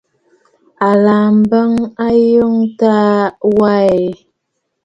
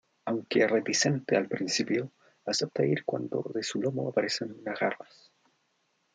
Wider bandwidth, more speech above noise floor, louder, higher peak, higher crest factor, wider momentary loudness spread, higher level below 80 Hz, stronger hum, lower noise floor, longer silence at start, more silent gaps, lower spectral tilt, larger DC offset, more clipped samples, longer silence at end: second, 7.6 kHz vs 10 kHz; first, 60 dB vs 45 dB; first, -12 LUFS vs -29 LUFS; first, 0 dBFS vs -12 dBFS; second, 12 dB vs 20 dB; second, 6 LU vs 9 LU; first, -52 dBFS vs -78 dBFS; neither; about the same, -71 dBFS vs -74 dBFS; first, 0.8 s vs 0.25 s; neither; first, -8.5 dB/octave vs -4 dB/octave; neither; neither; second, 0.7 s vs 1.1 s